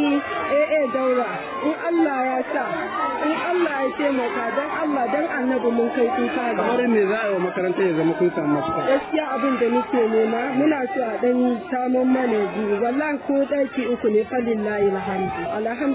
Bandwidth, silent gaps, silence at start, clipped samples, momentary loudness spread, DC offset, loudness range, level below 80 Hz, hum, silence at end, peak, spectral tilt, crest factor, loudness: 4 kHz; none; 0 s; under 0.1%; 5 LU; under 0.1%; 2 LU; -58 dBFS; none; 0 s; -8 dBFS; -10 dB/octave; 14 dB; -22 LUFS